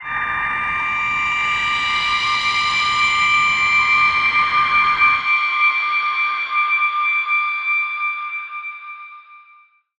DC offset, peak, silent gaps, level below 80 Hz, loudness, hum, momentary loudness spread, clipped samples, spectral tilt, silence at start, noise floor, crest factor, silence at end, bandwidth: under 0.1%; -4 dBFS; none; -50 dBFS; -16 LUFS; none; 9 LU; under 0.1%; -0.5 dB/octave; 0 s; -51 dBFS; 14 dB; 0.6 s; 9.6 kHz